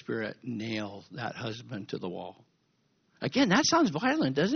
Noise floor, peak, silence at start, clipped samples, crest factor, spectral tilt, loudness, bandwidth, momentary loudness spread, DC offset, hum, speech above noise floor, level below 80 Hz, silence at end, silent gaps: -72 dBFS; -10 dBFS; 0.1 s; under 0.1%; 22 dB; -3.5 dB/octave; -30 LUFS; 6.6 kHz; 16 LU; under 0.1%; none; 43 dB; -68 dBFS; 0 s; none